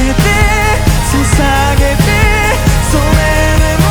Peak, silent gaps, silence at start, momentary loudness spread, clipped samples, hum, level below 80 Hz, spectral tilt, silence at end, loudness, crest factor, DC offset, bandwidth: 0 dBFS; none; 0 s; 2 LU; under 0.1%; none; -14 dBFS; -5 dB/octave; 0 s; -10 LUFS; 8 dB; under 0.1%; over 20 kHz